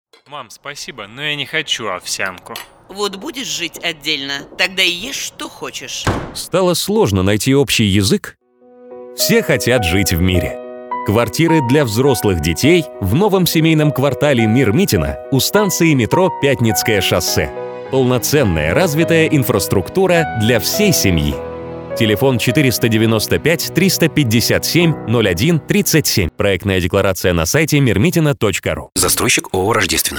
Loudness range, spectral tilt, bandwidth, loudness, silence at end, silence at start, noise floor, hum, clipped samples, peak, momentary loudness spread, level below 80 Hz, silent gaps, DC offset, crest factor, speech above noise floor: 5 LU; -4.5 dB/octave; over 20 kHz; -15 LUFS; 0 s; 0.3 s; -43 dBFS; none; under 0.1%; 0 dBFS; 10 LU; -36 dBFS; none; under 0.1%; 16 dB; 29 dB